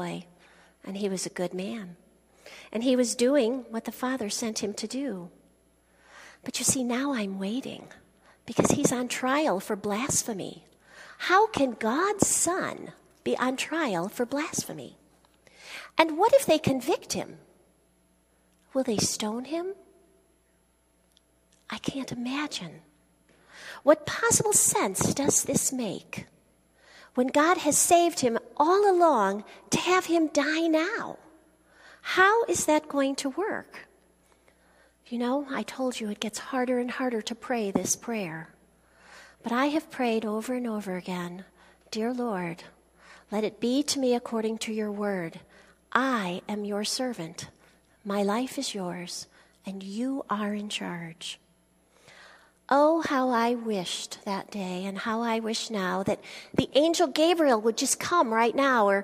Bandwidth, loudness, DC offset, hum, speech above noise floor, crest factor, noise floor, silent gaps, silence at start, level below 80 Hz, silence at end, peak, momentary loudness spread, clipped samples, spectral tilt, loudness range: 15.5 kHz; -27 LUFS; under 0.1%; none; 40 dB; 26 dB; -67 dBFS; none; 0 s; -64 dBFS; 0 s; -2 dBFS; 16 LU; under 0.1%; -3 dB/octave; 9 LU